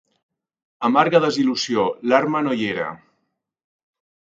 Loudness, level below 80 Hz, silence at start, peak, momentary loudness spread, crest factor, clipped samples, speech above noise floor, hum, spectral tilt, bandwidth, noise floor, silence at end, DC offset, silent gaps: -19 LUFS; -66 dBFS; 0.8 s; 0 dBFS; 9 LU; 22 dB; under 0.1%; 55 dB; none; -5 dB/octave; 7.8 kHz; -74 dBFS; 1.35 s; under 0.1%; none